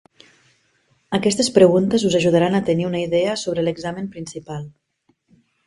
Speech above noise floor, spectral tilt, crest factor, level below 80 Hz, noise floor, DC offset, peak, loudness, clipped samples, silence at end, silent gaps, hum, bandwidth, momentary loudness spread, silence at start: 47 dB; -5.5 dB/octave; 20 dB; -56 dBFS; -66 dBFS; under 0.1%; 0 dBFS; -18 LUFS; under 0.1%; 1 s; none; none; 11.5 kHz; 18 LU; 1.1 s